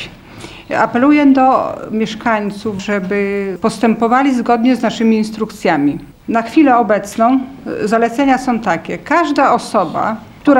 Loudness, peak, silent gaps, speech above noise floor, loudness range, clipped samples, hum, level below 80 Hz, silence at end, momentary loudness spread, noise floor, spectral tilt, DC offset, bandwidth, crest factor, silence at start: -14 LUFS; 0 dBFS; none; 20 dB; 1 LU; under 0.1%; none; -48 dBFS; 0 s; 10 LU; -34 dBFS; -6 dB/octave; under 0.1%; 13 kHz; 14 dB; 0 s